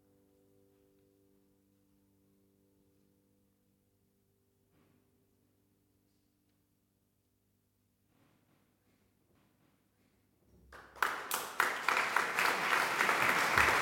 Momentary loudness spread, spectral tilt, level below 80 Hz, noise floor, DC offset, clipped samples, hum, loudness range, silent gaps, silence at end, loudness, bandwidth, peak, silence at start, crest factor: 8 LU; -1.5 dB/octave; -66 dBFS; -77 dBFS; under 0.1%; under 0.1%; none; 12 LU; none; 0 s; -31 LUFS; 17 kHz; -12 dBFS; 10.7 s; 26 dB